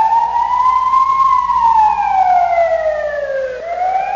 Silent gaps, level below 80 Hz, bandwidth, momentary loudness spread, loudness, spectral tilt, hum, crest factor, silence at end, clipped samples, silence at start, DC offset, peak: none; -44 dBFS; 7.4 kHz; 8 LU; -13 LUFS; -3.5 dB/octave; 60 Hz at -45 dBFS; 10 dB; 0 s; under 0.1%; 0 s; under 0.1%; -4 dBFS